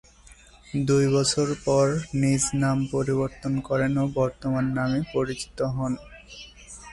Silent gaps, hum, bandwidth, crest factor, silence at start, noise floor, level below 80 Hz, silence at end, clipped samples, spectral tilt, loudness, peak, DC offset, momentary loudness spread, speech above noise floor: none; none; 11.5 kHz; 14 dB; 0.3 s; -51 dBFS; -48 dBFS; 0 s; under 0.1%; -5.5 dB/octave; -25 LUFS; -10 dBFS; under 0.1%; 13 LU; 27 dB